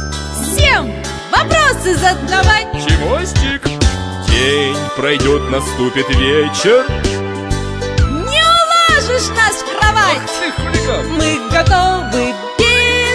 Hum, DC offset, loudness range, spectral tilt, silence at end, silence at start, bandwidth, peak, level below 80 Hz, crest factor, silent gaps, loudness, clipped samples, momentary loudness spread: none; under 0.1%; 2 LU; -4 dB/octave; 0 s; 0 s; 11 kHz; 0 dBFS; -22 dBFS; 14 dB; none; -13 LUFS; under 0.1%; 9 LU